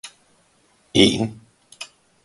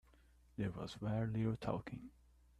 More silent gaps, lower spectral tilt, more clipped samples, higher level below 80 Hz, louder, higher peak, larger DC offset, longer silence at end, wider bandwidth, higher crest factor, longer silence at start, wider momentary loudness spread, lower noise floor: neither; second, -4.5 dB/octave vs -8 dB/octave; neither; first, -50 dBFS vs -62 dBFS; first, -19 LUFS vs -42 LUFS; first, -2 dBFS vs -24 dBFS; neither; about the same, 0.4 s vs 0.5 s; about the same, 11.5 kHz vs 11 kHz; about the same, 22 dB vs 20 dB; second, 0.05 s vs 0.6 s; first, 22 LU vs 14 LU; second, -60 dBFS vs -68 dBFS